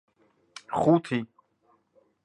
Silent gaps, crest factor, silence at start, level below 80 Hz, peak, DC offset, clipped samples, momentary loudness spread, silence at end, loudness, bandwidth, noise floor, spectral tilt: none; 20 dB; 0.7 s; -64 dBFS; -10 dBFS; under 0.1%; under 0.1%; 24 LU; 1 s; -26 LUFS; 11 kHz; -68 dBFS; -7.5 dB/octave